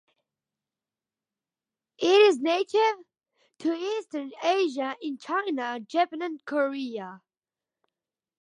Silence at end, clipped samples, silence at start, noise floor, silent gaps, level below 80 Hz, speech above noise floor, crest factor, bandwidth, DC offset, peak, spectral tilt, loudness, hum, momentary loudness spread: 1.25 s; under 0.1%; 2 s; under -90 dBFS; none; -88 dBFS; over 64 dB; 20 dB; 10 kHz; under 0.1%; -8 dBFS; -3 dB/octave; -26 LUFS; none; 16 LU